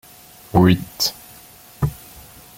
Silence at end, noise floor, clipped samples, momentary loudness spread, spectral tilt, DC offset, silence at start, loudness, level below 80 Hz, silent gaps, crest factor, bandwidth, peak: 0.65 s; -45 dBFS; under 0.1%; 25 LU; -5.5 dB/octave; under 0.1%; 0.55 s; -19 LUFS; -42 dBFS; none; 20 dB; 17 kHz; -2 dBFS